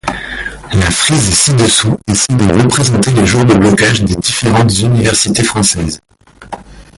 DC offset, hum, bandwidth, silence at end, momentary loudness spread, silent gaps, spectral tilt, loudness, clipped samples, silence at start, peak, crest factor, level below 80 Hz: under 0.1%; none; 11.5 kHz; 0.15 s; 13 LU; none; -4 dB/octave; -10 LUFS; under 0.1%; 0.05 s; 0 dBFS; 10 dB; -30 dBFS